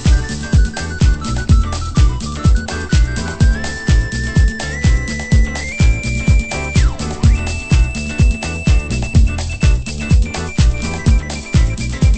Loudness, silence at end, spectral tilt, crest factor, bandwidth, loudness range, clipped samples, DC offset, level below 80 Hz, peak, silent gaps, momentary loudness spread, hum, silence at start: -16 LUFS; 0 s; -5.5 dB/octave; 14 dB; 8.8 kHz; 1 LU; under 0.1%; under 0.1%; -16 dBFS; 0 dBFS; none; 4 LU; none; 0 s